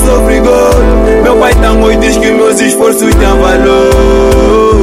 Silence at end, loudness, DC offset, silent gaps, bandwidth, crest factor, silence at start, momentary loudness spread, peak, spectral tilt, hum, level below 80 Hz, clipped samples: 0 s; -6 LUFS; under 0.1%; none; 16 kHz; 6 dB; 0 s; 1 LU; 0 dBFS; -5 dB/octave; none; -12 dBFS; 0.5%